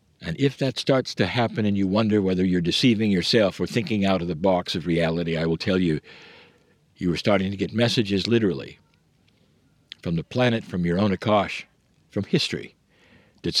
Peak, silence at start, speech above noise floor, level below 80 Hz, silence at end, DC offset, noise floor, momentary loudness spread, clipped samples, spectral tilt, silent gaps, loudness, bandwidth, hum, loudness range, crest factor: -6 dBFS; 0.2 s; 39 dB; -54 dBFS; 0 s; under 0.1%; -62 dBFS; 10 LU; under 0.1%; -6 dB/octave; none; -23 LUFS; 13.5 kHz; none; 4 LU; 18 dB